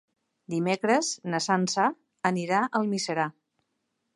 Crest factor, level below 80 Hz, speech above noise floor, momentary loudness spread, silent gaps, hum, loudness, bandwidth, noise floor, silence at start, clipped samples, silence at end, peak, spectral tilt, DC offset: 20 dB; -78 dBFS; 52 dB; 6 LU; none; none; -27 LUFS; 11.5 kHz; -79 dBFS; 0.5 s; under 0.1%; 0.85 s; -8 dBFS; -4 dB/octave; under 0.1%